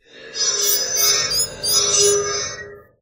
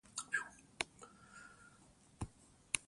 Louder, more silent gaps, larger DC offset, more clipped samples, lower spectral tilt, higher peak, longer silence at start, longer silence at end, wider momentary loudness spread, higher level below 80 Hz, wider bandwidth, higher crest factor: first, -16 LUFS vs -44 LUFS; neither; neither; neither; second, 0.5 dB/octave vs -1.5 dB/octave; first, -2 dBFS vs -10 dBFS; about the same, 0.15 s vs 0.1 s; first, 0.2 s vs 0.05 s; second, 12 LU vs 23 LU; first, -52 dBFS vs -66 dBFS; first, 16 kHz vs 11.5 kHz; second, 18 dB vs 38 dB